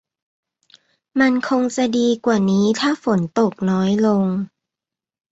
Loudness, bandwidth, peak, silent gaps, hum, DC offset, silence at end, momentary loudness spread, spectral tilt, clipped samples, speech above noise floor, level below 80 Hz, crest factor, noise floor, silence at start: -18 LUFS; 8 kHz; -2 dBFS; none; none; under 0.1%; 0.85 s; 4 LU; -6 dB/octave; under 0.1%; 70 dB; -60 dBFS; 16 dB; -88 dBFS; 1.15 s